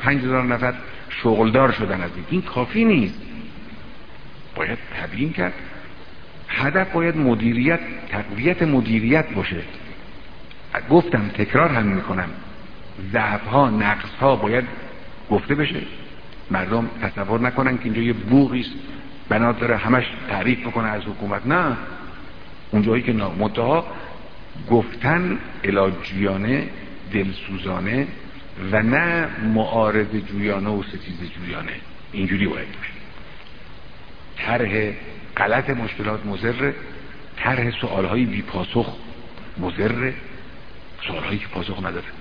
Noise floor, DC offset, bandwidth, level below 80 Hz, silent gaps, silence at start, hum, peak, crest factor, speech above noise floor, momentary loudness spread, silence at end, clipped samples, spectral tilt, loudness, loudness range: -41 dBFS; 2%; 5.4 kHz; -44 dBFS; none; 0 s; none; 0 dBFS; 22 dB; 21 dB; 21 LU; 0 s; under 0.1%; -9 dB/octave; -21 LUFS; 6 LU